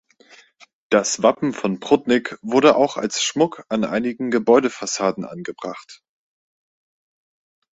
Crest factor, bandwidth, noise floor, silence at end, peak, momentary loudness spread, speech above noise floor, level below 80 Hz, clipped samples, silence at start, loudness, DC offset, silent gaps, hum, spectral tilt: 20 dB; 8.2 kHz; -51 dBFS; 1.75 s; -2 dBFS; 15 LU; 32 dB; -62 dBFS; under 0.1%; 0.9 s; -19 LUFS; under 0.1%; none; none; -4 dB/octave